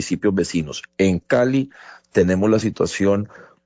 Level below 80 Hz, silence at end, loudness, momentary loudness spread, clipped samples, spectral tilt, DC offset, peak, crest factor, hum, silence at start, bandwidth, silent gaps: -44 dBFS; 0.25 s; -20 LUFS; 8 LU; under 0.1%; -6 dB/octave; under 0.1%; -4 dBFS; 16 dB; none; 0 s; 8 kHz; none